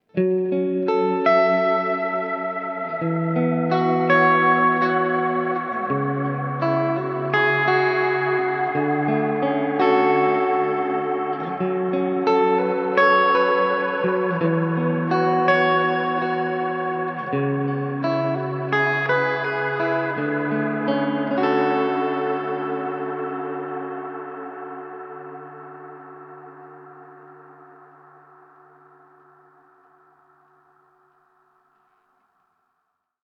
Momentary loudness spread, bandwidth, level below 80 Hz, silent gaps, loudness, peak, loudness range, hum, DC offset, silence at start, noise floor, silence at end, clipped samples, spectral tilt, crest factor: 13 LU; 6.2 kHz; -74 dBFS; none; -21 LUFS; -4 dBFS; 11 LU; none; under 0.1%; 0.15 s; -75 dBFS; 5.6 s; under 0.1%; -8.5 dB/octave; 18 dB